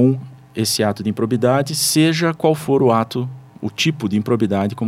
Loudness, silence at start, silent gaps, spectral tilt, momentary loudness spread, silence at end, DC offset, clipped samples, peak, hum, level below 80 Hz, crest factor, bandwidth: -18 LUFS; 0 s; none; -5 dB/octave; 11 LU; 0 s; under 0.1%; under 0.1%; -2 dBFS; none; -62 dBFS; 16 dB; 16.5 kHz